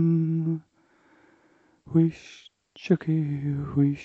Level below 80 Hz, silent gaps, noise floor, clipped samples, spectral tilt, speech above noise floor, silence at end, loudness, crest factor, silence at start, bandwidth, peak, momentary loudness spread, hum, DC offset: -60 dBFS; none; -63 dBFS; under 0.1%; -9.5 dB/octave; 38 dB; 0 s; -26 LUFS; 18 dB; 0 s; 6.8 kHz; -8 dBFS; 15 LU; none; under 0.1%